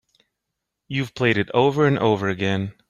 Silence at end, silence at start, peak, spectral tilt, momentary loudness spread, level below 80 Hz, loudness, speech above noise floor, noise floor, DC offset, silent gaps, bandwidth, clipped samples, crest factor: 0.2 s; 0.9 s; -4 dBFS; -7 dB/octave; 9 LU; -58 dBFS; -21 LUFS; 60 dB; -81 dBFS; under 0.1%; none; 12 kHz; under 0.1%; 18 dB